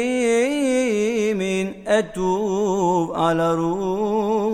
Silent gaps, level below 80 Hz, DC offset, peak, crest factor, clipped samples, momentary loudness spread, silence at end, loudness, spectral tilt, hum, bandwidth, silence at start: none; -52 dBFS; under 0.1%; -6 dBFS; 14 dB; under 0.1%; 4 LU; 0 s; -21 LUFS; -5.5 dB/octave; none; 14 kHz; 0 s